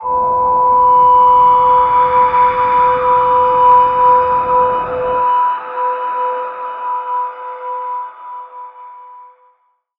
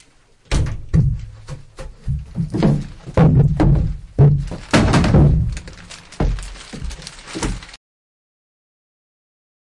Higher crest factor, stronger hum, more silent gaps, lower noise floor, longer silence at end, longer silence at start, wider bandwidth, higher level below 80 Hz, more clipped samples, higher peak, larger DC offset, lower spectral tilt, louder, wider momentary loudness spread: about the same, 12 dB vs 16 dB; neither; neither; first, -58 dBFS vs -51 dBFS; second, 0.75 s vs 2 s; second, 0 s vs 0.5 s; second, 4.8 kHz vs 11 kHz; second, -46 dBFS vs -26 dBFS; neither; about the same, -2 dBFS vs -4 dBFS; neither; about the same, -7.5 dB/octave vs -7 dB/octave; first, -12 LUFS vs -18 LUFS; second, 16 LU vs 21 LU